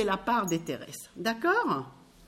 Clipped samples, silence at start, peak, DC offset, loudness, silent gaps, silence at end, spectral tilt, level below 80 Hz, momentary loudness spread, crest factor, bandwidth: under 0.1%; 0 s; -14 dBFS; under 0.1%; -29 LUFS; none; 0.3 s; -4.5 dB/octave; -60 dBFS; 13 LU; 16 dB; 16 kHz